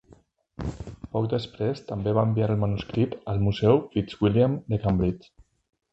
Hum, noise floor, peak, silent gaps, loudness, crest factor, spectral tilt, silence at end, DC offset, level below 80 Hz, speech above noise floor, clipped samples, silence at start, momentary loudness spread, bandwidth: none; -57 dBFS; -6 dBFS; none; -26 LUFS; 20 dB; -9 dB/octave; 0.75 s; under 0.1%; -44 dBFS; 33 dB; under 0.1%; 0.6 s; 13 LU; 7.8 kHz